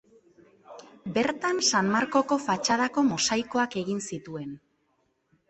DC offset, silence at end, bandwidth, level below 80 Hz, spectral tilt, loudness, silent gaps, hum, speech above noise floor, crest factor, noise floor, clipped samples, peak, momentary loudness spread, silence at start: under 0.1%; 0.9 s; 8.6 kHz; -66 dBFS; -3 dB/octave; -26 LUFS; none; none; 46 dB; 18 dB; -72 dBFS; under 0.1%; -10 dBFS; 15 LU; 0.7 s